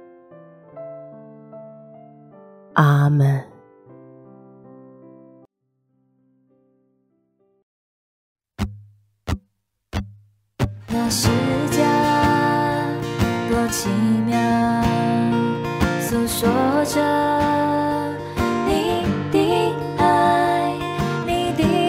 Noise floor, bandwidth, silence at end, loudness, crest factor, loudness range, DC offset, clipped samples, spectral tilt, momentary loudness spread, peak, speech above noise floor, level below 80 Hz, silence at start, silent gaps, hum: -70 dBFS; 16 kHz; 0 s; -20 LUFS; 20 dB; 15 LU; under 0.1%; under 0.1%; -5.5 dB/octave; 14 LU; -2 dBFS; 54 dB; -42 dBFS; 0 s; 7.63-8.36 s; none